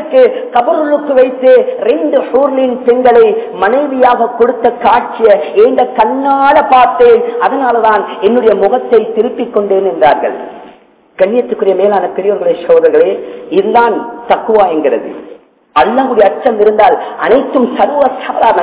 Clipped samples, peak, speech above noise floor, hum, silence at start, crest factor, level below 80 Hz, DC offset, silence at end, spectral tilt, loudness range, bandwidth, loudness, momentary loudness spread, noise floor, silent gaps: 3%; 0 dBFS; 32 dB; none; 0 s; 10 dB; -50 dBFS; under 0.1%; 0 s; -9 dB/octave; 3 LU; 4 kHz; -9 LUFS; 7 LU; -41 dBFS; none